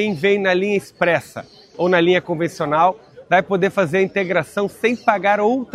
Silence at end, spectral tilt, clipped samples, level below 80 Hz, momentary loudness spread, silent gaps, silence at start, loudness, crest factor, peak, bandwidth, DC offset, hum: 0.1 s; -6 dB/octave; under 0.1%; -60 dBFS; 7 LU; none; 0 s; -18 LUFS; 18 dB; 0 dBFS; 14 kHz; under 0.1%; none